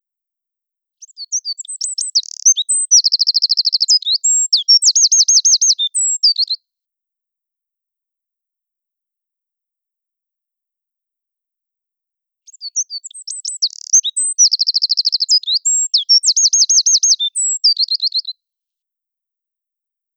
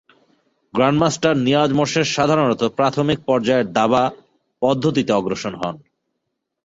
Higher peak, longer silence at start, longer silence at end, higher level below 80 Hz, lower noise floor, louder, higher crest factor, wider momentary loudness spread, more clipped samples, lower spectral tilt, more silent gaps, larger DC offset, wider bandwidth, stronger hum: about the same, -2 dBFS vs -2 dBFS; first, 1 s vs 0.75 s; first, 1.85 s vs 0.9 s; second, under -90 dBFS vs -54 dBFS; first, -84 dBFS vs -76 dBFS; first, -11 LUFS vs -18 LUFS; about the same, 16 dB vs 16 dB; first, 13 LU vs 8 LU; neither; second, 15 dB/octave vs -5.5 dB/octave; neither; neither; first, over 20 kHz vs 8 kHz; neither